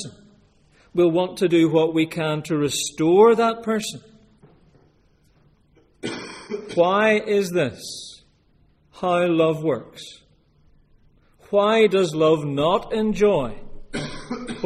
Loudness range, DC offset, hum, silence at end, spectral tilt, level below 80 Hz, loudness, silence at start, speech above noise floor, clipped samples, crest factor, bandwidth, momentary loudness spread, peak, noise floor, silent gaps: 6 LU; under 0.1%; none; 0 s; -5 dB/octave; -50 dBFS; -20 LUFS; 0 s; 40 dB; under 0.1%; 18 dB; 15 kHz; 17 LU; -4 dBFS; -59 dBFS; none